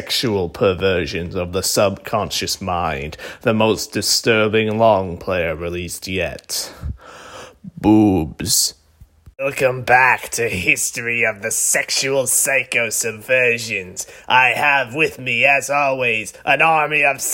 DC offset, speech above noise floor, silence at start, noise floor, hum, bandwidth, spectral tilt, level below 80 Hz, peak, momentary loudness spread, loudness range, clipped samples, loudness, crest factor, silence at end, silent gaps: under 0.1%; 31 dB; 0 s; -49 dBFS; none; 16.5 kHz; -3 dB/octave; -46 dBFS; 0 dBFS; 11 LU; 4 LU; under 0.1%; -17 LUFS; 18 dB; 0 s; none